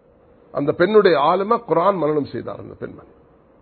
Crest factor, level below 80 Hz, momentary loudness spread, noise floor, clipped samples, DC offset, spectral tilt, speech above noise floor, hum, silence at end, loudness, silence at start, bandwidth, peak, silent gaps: 18 dB; -56 dBFS; 19 LU; -52 dBFS; under 0.1%; under 0.1%; -11 dB/octave; 33 dB; none; 0.65 s; -18 LUFS; 0.55 s; 4.5 kHz; -2 dBFS; none